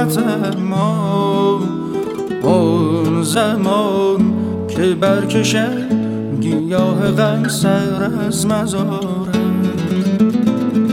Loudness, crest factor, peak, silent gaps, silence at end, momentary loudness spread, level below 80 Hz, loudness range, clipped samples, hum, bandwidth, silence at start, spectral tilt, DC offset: -16 LUFS; 14 dB; 0 dBFS; none; 0 s; 5 LU; -50 dBFS; 1 LU; under 0.1%; none; 16.5 kHz; 0 s; -6 dB/octave; under 0.1%